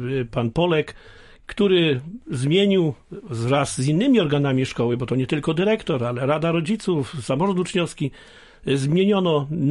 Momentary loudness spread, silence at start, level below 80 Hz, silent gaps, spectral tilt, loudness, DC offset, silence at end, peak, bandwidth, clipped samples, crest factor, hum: 10 LU; 0 s; -50 dBFS; none; -6 dB/octave; -21 LUFS; under 0.1%; 0 s; -6 dBFS; 11.5 kHz; under 0.1%; 16 dB; none